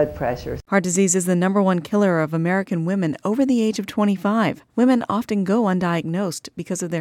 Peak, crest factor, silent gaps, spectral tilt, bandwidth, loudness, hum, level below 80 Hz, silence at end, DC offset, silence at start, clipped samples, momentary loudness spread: -4 dBFS; 16 dB; none; -5.5 dB/octave; 16.5 kHz; -20 LUFS; none; -50 dBFS; 0 s; under 0.1%; 0 s; under 0.1%; 7 LU